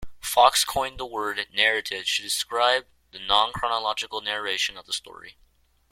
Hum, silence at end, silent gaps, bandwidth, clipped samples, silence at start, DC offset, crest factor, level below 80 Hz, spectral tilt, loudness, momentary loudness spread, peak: none; 0.6 s; none; 16.5 kHz; under 0.1%; 0 s; under 0.1%; 24 dB; -54 dBFS; 0 dB/octave; -24 LUFS; 12 LU; -2 dBFS